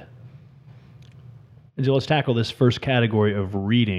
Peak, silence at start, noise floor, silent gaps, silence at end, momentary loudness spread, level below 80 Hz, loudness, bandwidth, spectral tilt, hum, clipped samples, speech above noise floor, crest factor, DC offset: -6 dBFS; 0 s; -47 dBFS; none; 0 s; 6 LU; -56 dBFS; -22 LUFS; 10 kHz; -7.5 dB/octave; none; under 0.1%; 27 dB; 18 dB; under 0.1%